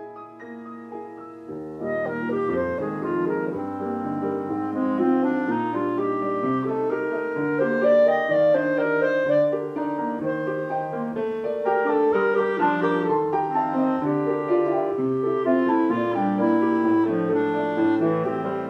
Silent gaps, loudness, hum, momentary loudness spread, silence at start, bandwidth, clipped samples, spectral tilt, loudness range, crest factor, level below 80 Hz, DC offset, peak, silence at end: none; -23 LUFS; none; 8 LU; 0 s; 6.6 kHz; under 0.1%; -8.5 dB/octave; 5 LU; 14 dB; -66 dBFS; under 0.1%; -8 dBFS; 0 s